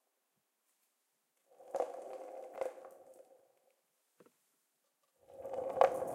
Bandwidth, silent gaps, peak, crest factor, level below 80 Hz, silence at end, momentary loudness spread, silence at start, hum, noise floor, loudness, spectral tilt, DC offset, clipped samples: 16 kHz; none; -12 dBFS; 32 dB; -82 dBFS; 0 s; 27 LU; 1.6 s; none; -83 dBFS; -39 LUFS; -4.5 dB/octave; under 0.1%; under 0.1%